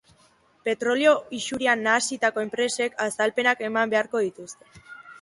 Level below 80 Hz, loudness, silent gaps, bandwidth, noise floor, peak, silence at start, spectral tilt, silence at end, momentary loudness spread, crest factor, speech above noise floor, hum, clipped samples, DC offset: -68 dBFS; -24 LUFS; none; 11.5 kHz; -60 dBFS; -6 dBFS; 0.65 s; -2.5 dB/octave; 0.05 s; 10 LU; 20 dB; 36 dB; none; under 0.1%; under 0.1%